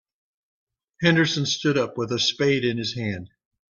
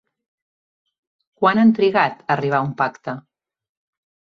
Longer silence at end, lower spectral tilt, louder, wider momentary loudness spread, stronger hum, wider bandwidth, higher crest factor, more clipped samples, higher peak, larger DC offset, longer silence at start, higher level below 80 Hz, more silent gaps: second, 0.45 s vs 1.15 s; second, -4.5 dB/octave vs -7.5 dB/octave; second, -23 LUFS vs -18 LUFS; second, 9 LU vs 16 LU; neither; first, 7.4 kHz vs 6.4 kHz; about the same, 20 dB vs 18 dB; neither; second, -6 dBFS vs -2 dBFS; neither; second, 1 s vs 1.4 s; about the same, -62 dBFS vs -64 dBFS; neither